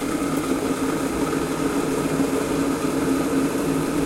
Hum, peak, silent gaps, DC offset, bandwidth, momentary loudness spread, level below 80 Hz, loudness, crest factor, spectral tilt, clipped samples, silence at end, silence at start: none; -10 dBFS; none; under 0.1%; 16 kHz; 2 LU; -44 dBFS; -23 LUFS; 14 dB; -5 dB/octave; under 0.1%; 0 s; 0 s